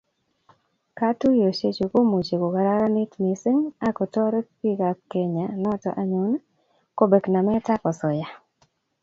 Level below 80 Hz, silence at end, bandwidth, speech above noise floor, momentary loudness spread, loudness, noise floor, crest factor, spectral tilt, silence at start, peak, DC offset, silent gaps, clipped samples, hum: -62 dBFS; 0.65 s; 7.6 kHz; 44 dB; 7 LU; -23 LUFS; -67 dBFS; 20 dB; -8 dB/octave; 0.95 s; -4 dBFS; under 0.1%; none; under 0.1%; none